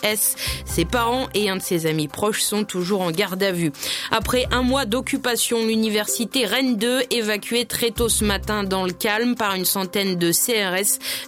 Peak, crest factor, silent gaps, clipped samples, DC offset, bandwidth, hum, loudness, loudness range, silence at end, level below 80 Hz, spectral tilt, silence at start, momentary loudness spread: -2 dBFS; 20 dB; none; under 0.1%; under 0.1%; 17 kHz; none; -21 LUFS; 2 LU; 0 s; -40 dBFS; -3 dB/octave; 0 s; 4 LU